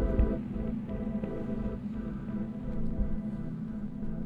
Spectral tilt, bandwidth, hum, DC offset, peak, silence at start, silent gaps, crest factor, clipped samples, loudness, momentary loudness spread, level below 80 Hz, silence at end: -10.5 dB/octave; 4.6 kHz; none; under 0.1%; -14 dBFS; 0 s; none; 18 dB; under 0.1%; -35 LUFS; 6 LU; -36 dBFS; 0 s